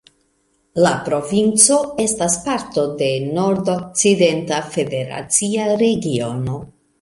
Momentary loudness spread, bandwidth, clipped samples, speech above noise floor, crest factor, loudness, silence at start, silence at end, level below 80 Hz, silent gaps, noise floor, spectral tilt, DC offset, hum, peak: 11 LU; 12 kHz; under 0.1%; 46 dB; 18 dB; -17 LUFS; 0.75 s; 0.35 s; -52 dBFS; none; -63 dBFS; -4 dB/octave; under 0.1%; none; 0 dBFS